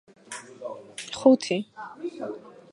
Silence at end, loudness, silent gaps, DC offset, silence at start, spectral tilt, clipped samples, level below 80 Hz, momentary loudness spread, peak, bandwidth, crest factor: 0.25 s; -25 LUFS; none; under 0.1%; 0.3 s; -4.5 dB/octave; under 0.1%; -72 dBFS; 20 LU; -4 dBFS; 11.5 kHz; 24 dB